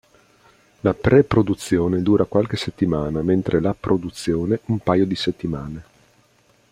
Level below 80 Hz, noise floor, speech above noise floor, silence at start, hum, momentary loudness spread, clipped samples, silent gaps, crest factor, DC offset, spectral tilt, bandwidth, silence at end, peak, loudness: -46 dBFS; -58 dBFS; 39 dB; 0.85 s; none; 9 LU; under 0.1%; none; 18 dB; under 0.1%; -7 dB/octave; 15 kHz; 0.9 s; -2 dBFS; -20 LUFS